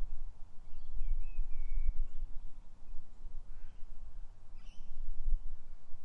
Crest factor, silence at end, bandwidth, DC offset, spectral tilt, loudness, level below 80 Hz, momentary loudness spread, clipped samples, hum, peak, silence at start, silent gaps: 12 dB; 0 s; 1 kHz; under 0.1%; -7 dB/octave; -48 LUFS; -36 dBFS; 15 LU; under 0.1%; none; -18 dBFS; 0 s; none